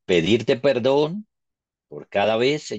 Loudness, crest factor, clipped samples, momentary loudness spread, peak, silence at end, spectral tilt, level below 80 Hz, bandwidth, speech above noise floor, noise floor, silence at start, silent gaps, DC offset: -21 LUFS; 16 dB; under 0.1%; 10 LU; -6 dBFS; 0 s; -5.5 dB/octave; -60 dBFS; 8.4 kHz; 64 dB; -84 dBFS; 0.1 s; none; under 0.1%